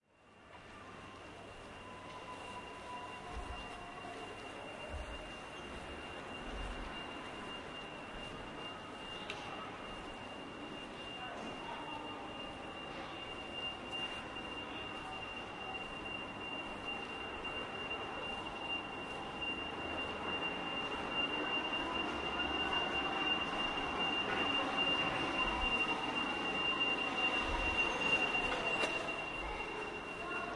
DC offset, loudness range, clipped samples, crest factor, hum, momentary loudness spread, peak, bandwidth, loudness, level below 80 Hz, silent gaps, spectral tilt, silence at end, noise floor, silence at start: under 0.1%; 13 LU; under 0.1%; 20 dB; none; 14 LU; -20 dBFS; 11.5 kHz; -38 LUFS; -56 dBFS; none; -3.5 dB/octave; 0 s; -62 dBFS; 0.2 s